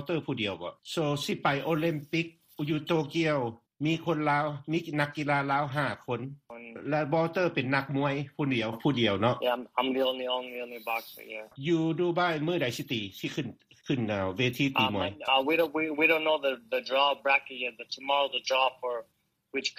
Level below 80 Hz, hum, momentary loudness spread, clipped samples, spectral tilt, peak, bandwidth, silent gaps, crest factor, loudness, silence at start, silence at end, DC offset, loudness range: -68 dBFS; none; 10 LU; under 0.1%; -5.5 dB/octave; -10 dBFS; 15.5 kHz; none; 18 dB; -29 LUFS; 0 s; 0.05 s; under 0.1%; 4 LU